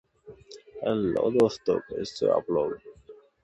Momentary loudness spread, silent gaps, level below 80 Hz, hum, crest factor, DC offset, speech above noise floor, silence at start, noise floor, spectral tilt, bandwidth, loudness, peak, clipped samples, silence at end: 20 LU; none; -60 dBFS; none; 18 dB; under 0.1%; 26 dB; 0.25 s; -52 dBFS; -6.5 dB/octave; 11 kHz; -27 LUFS; -10 dBFS; under 0.1%; 0.3 s